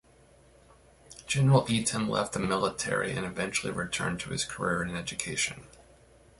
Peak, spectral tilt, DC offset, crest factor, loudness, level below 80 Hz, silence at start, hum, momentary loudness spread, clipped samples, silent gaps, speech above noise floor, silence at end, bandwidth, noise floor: -10 dBFS; -4.5 dB/octave; under 0.1%; 22 dB; -29 LUFS; -56 dBFS; 1.1 s; none; 9 LU; under 0.1%; none; 30 dB; 0.7 s; 11.5 kHz; -59 dBFS